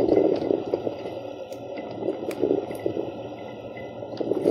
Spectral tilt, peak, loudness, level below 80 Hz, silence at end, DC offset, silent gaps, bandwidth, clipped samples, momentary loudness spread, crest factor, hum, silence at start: -7.5 dB/octave; -6 dBFS; -29 LUFS; -60 dBFS; 0 s; under 0.1%; none; 14.5 kHz; under 0.1%; 14 LU; 20 dB; none; 0 s